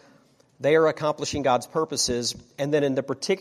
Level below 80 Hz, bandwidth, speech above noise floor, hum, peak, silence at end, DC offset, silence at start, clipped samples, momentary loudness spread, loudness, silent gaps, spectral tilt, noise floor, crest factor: -54 dBFS; 15.5 kHz; 35 dB; none; -8 dBFS; 0 s; under 0.1%; 0.6 s; under 0.1%; 8 LU; -24 LUFS; none; -4 dB/octave; -59 dBFS; 16 dB